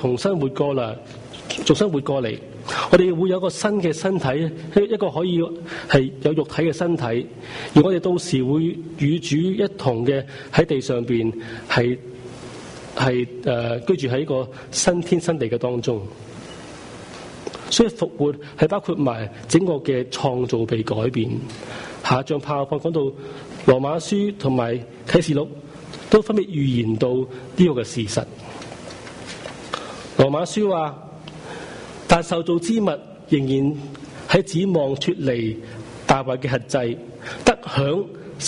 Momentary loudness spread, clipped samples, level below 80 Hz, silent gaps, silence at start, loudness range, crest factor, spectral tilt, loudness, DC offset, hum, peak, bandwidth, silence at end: 17 LU; under 0.1%; -48 dBFS; none; 0 s; 3 LU; 20 dB; -5.5 dB/octave; -21 LUFS; under 0.1%; none; -2 dBFS; 11 kHz; 0 s